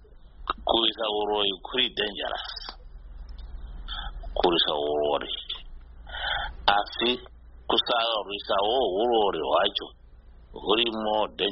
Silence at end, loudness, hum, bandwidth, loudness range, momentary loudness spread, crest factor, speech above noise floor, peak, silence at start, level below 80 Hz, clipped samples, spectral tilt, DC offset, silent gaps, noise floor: 0 s; -26 LUFS; none; 5.8 kHz; 4 LU; 17 LU; 24 dB; 24 dB; -4 dBFS; 0 s; -44 dBFS; under 0.1%; -0.5 dB/octave; under 0.1%; none; -49 dBFS